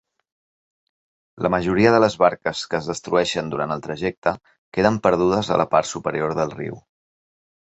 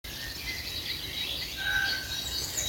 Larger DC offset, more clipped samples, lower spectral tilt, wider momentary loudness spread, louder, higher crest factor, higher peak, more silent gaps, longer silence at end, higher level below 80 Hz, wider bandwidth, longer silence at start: neither; neither; first, -5.5 dB/octave vs -1 dB/octave; first, 10 LU vs 6 LU; first, -21 LUFS vs -31 LUFS; about the same, 20 dB vs 18 dB; first, -2 dBFS vs -16 dBFS; first, 4.18-4.22 s, 4.58-4.72 s vs none; first, 0.95 s vs 0 s; about the same, -50 dBFS vs -48 dBFS; second, 8.2 kHz vs 17 kHz; first, 1.35 s vs 0.05 s